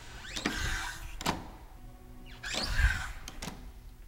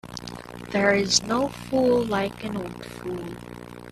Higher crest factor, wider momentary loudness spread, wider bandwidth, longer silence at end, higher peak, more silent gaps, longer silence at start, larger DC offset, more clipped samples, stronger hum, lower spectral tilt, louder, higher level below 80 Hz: about the same, 22 dB vs 22 dB; first, 22 LU vs 18 LU; first, 16.5 kHz vs 14.5 kHz; about the same, 0 s vs 0 s; second, -12 dBFS vs -4 dBFS; neither; about the same, 0 s vs 0.05 s; neither; neither; second, none vs 60 Hz at -40 dBFS; about the same, -3 dB/octave vs -3.5 dB/octave; second, -35 LUFS vs -24 LUFS; first, -38 dBFS vs -50 dBFS